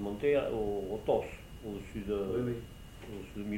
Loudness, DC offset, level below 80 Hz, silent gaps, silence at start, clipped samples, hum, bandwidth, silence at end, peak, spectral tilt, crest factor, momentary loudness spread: -35 LUFS; under 0.1%; -50 dBFS; none; 0 s; under 0.1%; none; 17 kHz; 0 s; -16 dBFS; -7 dB/octave; 18 dB; 15 LU